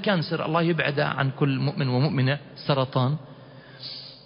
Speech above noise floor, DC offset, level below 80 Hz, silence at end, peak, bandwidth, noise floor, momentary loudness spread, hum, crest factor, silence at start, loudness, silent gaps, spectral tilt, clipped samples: 22 dB; under 0.1%; -62 dBFS; 0.05 s; -8 dBFS; 5.4 kHz; -46 dBFS; 13 LU; none; 18 dB; 0 s; -25 LUFS; none; -11 dB/octave; under 0.1%